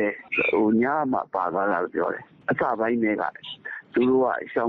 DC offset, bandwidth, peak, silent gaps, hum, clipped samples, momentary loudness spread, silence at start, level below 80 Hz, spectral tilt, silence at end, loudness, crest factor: under 0.1%; 4.7 kHz; -10 dBFS; none; none; under 0.1%; 10 LU; 0 s; -64 dBFS; -4 dB/octave; 0 s; -24 LUFS; 14 dB